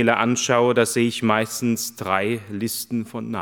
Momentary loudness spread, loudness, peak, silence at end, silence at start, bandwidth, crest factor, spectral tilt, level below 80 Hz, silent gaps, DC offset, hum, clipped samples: 9 LU; -21 LUFS; -2 dBFS; 0 s; 0 s; 19 kHz; 20 dB; -4 dB/octave; -70 dBFS; none; under 0.1%; none; under 0.1%